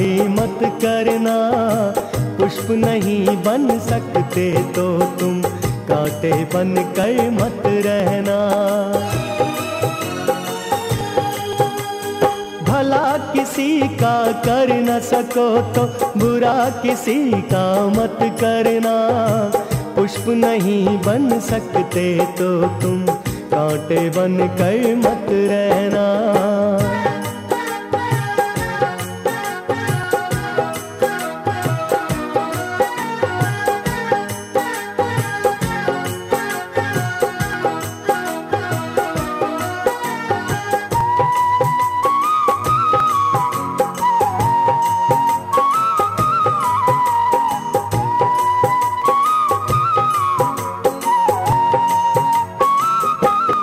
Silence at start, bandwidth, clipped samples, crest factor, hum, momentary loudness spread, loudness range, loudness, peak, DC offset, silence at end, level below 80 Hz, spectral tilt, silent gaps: 0 s; 16 kHz; under 0.1%; 16 dB; none; 6 LU; 4 LU; -18 LUFS; -2 dBFS; under 0.1%; 0 s; -46 dBFS; -5.5 dB/octave; none